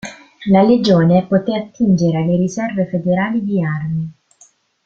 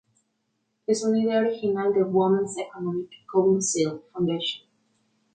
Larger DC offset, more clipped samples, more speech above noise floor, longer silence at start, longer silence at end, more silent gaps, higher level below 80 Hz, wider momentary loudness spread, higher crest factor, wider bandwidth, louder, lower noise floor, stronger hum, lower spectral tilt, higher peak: neither; neither; second, 37 dB vs 51 dB; second, 0.05 s vs 0.9 s; about the same, 0.75 s vs 0.75 s; neither; first, -52 dBFS vs -70 dBFS; about the same, 11 LU vs 9 LU; about the same, 14 dB vs 16 dB; second, 7.6 kHz vs 9.4 kHz; first, -16 LUFS vs -25 LUFS; second, -52 dBFS vs -75 dBFS; neither; first, -7.5 dB/octave vs -5 dB/octave; first, -2 dBFS vs -10 dBFS